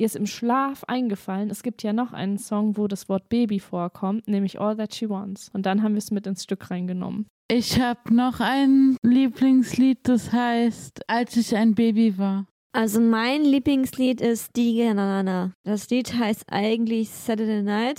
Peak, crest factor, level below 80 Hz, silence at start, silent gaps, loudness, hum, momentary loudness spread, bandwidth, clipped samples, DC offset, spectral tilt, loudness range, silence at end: -8 dBFS; 14 dB; -60 dBFS; 0 s; 7.30-7.49 s, 8.98-9.02 s, 12.51-12.70 s, 15.55-15.64 s; -23 LUFS; none; 10 LU; 16 kHz; under 0.1%; under 0.1%; -5.5 dB/octave; 6 LU; 0.05 s